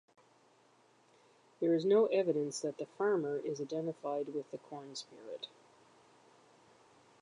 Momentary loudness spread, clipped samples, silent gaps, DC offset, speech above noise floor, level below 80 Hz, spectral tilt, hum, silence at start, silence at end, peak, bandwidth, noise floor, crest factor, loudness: 18 LU; under 0.1%; none; under 0.1%; 33 dB; under -90 dBFS; -5.5 dB/octave; none; 1.6 s; 1.75 s; -18 dBFS; 11 kHz; -68 dBFS; 18 dB; -35 LUFS